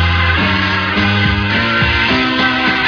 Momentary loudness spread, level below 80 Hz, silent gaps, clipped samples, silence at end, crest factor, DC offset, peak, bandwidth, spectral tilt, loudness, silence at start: 2 LU; -28 dBFS; none; under 0.1%; 0 s; 12 dB; under 0.1%; 0 dBFS; 5.4 kHz; -6 dB/octave; -12 LUFS; 0 s